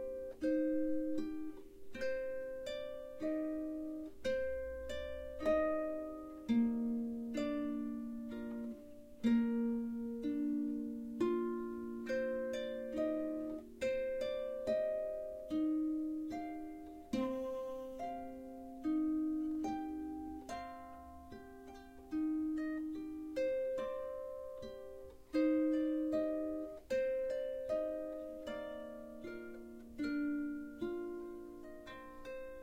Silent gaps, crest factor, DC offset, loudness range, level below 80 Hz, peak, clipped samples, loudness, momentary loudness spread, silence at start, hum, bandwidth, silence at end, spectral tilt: none; 16 dB; under 0.1%; 5 LU; -62 dBFS; -24 dBFS; under 0.1%; -40 LUFS; 14 LU; 0 s; none; 15.5 kHz; 0 s; -6.5 dB/octave